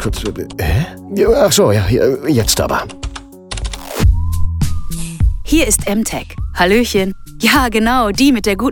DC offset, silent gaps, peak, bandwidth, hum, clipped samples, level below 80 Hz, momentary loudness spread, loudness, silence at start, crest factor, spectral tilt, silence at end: under 0.1%; none; 0 dBFS; 17.5 kHz; none; under 0.1%; -22 dBFS; 13 LU; -15 LUFS; 0 s; 14 dB; -4.5 dB/octave; 0 s